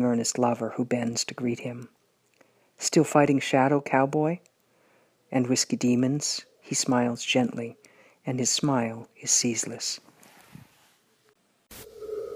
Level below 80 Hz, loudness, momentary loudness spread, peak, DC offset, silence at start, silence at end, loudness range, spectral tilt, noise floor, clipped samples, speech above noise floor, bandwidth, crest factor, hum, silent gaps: -70 dBFS; -26 LUFS; 15 LU; -6 dBFS; under 0.1%; 0 s; 0 s; 3 LU; -4 dB/octave; -66 dBFS; under 0.1%; 41 dB; 15.5 kHz; 20 dB; none; none